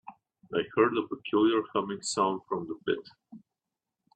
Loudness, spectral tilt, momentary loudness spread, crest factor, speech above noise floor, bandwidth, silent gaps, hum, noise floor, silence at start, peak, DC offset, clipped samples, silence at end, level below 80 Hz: -29 LUFS; -4.5 dB/octave; 9 LU; 20 dB; 59 dB; 9.6 kHz; none; none; -88 dBFS; 0.05 s; -10 dBFS; under 0.1%; under 0.1%; 0.8 s; -72 dBFS